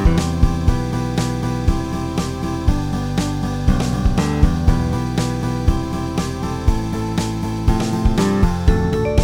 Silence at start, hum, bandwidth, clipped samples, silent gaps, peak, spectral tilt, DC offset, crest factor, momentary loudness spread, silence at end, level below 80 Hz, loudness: 0 s; none; 17 kHz; under 0.1%; none; 0 dBFS; -6.5 dB/octave; under 0.1%; 16 dB; 5 LU; 0 s; -22 dBFS; -20 LUFS